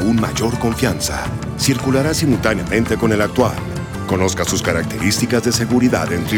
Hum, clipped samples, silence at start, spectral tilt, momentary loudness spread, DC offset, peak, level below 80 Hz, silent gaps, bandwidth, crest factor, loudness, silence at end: none; under 0.1%; 0 s; -5 dB/octave; 5 LU; under 0.1%; 0 dBFS; -34 dBFS; none; over 20 kHz; 16 dB; -17 LUFS; 0 s